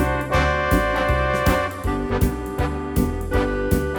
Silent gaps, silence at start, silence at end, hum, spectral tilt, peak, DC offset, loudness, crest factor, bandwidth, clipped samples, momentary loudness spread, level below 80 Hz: none; 0 s; 0 s; none; -6 dB/octave; -4 dBFS; under 0.1%; -21 LUFS; 18 dB; over 20 kHz; under 0.1%; 5 LU; -26 dBFS